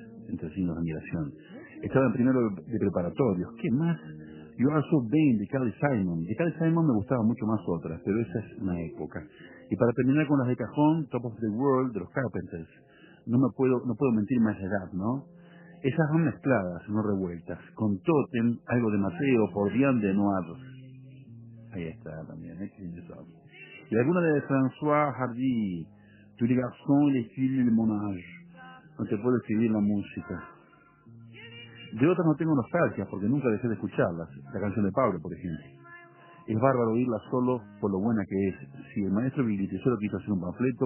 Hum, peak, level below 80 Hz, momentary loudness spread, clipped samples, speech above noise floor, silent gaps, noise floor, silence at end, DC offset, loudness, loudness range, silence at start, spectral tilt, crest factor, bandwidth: none; -8 dBFS; -56 dBFS; 18 LU; under 0.1%; 31 dB; none; -58 dBFS; 0 s; under 0.1%; -28 LUFS; 3 LU; 0 s; -8 dB/octave; 20 dB; 3.2 kHz